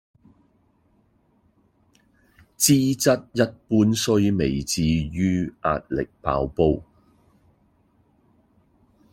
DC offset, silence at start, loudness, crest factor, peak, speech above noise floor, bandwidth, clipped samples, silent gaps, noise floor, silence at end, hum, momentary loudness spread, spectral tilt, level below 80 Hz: under 0.1%; 2.6 s; -22 LUFS; 20 dB; -4 dBFS; 42 dB; 16.5 kHz; under 0.1%; none; -63 dBFS; 2.3 s; none; 8 LU; -5 dB/octave; -46 dBFS